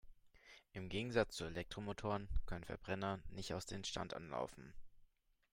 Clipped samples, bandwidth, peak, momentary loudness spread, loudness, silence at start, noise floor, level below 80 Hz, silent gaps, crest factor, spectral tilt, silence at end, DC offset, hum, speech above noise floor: under 0.1%; 16 kHz; -20 dBFS; 15 LU; -45 LUFS; 0.05 s; -72 dBFS; -54 dBFS; none; 24 dB; -5 dB/octave; 0.5 s; under 0.1%; none; 28 dB